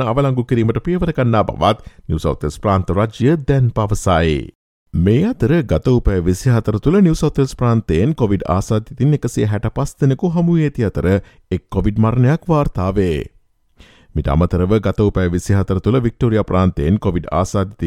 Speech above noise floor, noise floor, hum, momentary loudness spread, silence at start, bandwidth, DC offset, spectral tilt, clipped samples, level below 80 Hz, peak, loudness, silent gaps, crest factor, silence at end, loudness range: 33 dB; -49 dBFS; none; 6 LU; 0 s; 13.5 kHz; under 0.1%; -7.5 dB/octave; under 0.1%; -30 dBFS; -2 dBFS; -17 LUFS; 4.55-4.86 s; 14 dB; 0 s; 2 LU